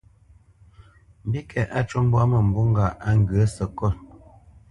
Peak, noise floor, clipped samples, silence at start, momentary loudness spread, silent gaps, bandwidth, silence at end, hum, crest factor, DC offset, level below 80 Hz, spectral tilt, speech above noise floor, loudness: -8 dBFS; -54 dBFS; under 0.1%; 1.25 s; 10 LU; none; 11 kHz; 0.65 s; none; 16 dB; under 0.1%; -40 dBFS; -8 dB/octave; 33 dB; -22 LUFS